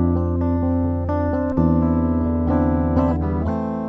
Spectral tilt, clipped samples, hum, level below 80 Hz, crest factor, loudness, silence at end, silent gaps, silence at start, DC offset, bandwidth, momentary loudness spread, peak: -11.5 dB/octave; under 0.1%; none; -30 dBFS; 14 dB; -20 LUFS; 0 s; none; 0 s; under 0.1%; 3.4 kHz; 4 LU; -6 dBFS